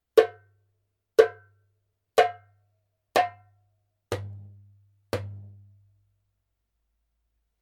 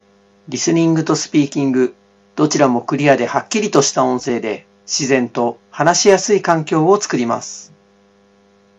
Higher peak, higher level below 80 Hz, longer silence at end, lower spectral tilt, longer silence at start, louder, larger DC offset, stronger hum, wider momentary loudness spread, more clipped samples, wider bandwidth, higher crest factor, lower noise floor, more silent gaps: second, -4 dBFS vs 0 dBFS; second, -68 dBFS vs -62 dBFS; first, 2.2 s vs 1.15 s; about the same, -4.5 dB/octave vs -4.5 dB/octave; second, 0.15 s vs 0.5 s; second, -26 LUFS vs -16 LUFS; neither; neither; first, 20 LU vs 9 LU; neither; first, 16.5 kHz vs 8.6 kHz; first, 26 dB vs 16 dB; first, -78 dBFS vs -52 dBFS; neither